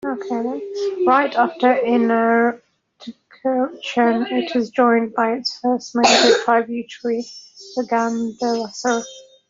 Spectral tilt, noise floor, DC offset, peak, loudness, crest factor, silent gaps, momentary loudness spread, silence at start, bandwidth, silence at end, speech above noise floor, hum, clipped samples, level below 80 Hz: -3 dB/octave; -39 dBFS; under 0.1%; -2 dBFS; -19 LUFS; 16 dB; none; 12 LU; 0.05 s; 7.8 kHz; 0.3 s; 20 dB; none; under 0.1%; -66 dBFS